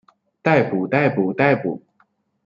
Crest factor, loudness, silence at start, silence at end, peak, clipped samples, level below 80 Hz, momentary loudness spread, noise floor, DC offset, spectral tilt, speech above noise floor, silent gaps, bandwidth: 18 dB; -19 LUFS; 0.45 s; 0.7 s; -2 dBFS; under 0.1%; -62 dBFS; 8 LU; -63 dBFS; under 0.1%; -8.5 dB/octave; 45 dB; none; 7.4 kHz